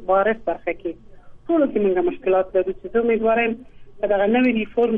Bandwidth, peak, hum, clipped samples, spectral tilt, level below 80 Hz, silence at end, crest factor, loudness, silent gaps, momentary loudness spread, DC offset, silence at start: 4.3 kHz; -8 dBFS; none; under 0.1%; -9 dB/octave; -48 dBFS; 0 s; 14 dB; -21 LUFS; none; 10 LU; under 0.1%; 0 s